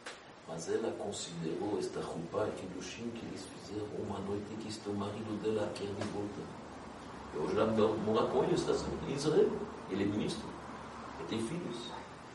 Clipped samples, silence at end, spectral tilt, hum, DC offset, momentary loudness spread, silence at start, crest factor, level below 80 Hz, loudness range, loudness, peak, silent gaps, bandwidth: under 0.1%; 0 s; -5.5 dB/octave; none; under 0.1%; 15 LU; 0 s; 20 dB; -60 dBFS; 7 LU; -37 LUFS; -16 dBFS; none; 11.5 kHz